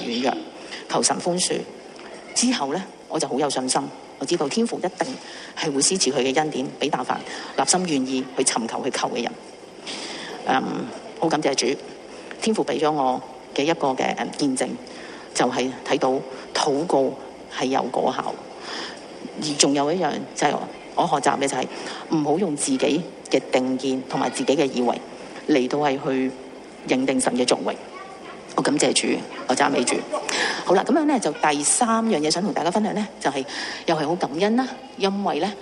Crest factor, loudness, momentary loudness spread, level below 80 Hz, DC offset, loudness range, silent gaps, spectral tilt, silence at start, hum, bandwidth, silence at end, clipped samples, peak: 22 dB; -23 LUFS; 13 LU; -64 dBFS; under 0.1%; 4 LU; none; -3 dB/octave; 0 s; none; 12 kHz; 0 s; under 0.1%; 0 dBFS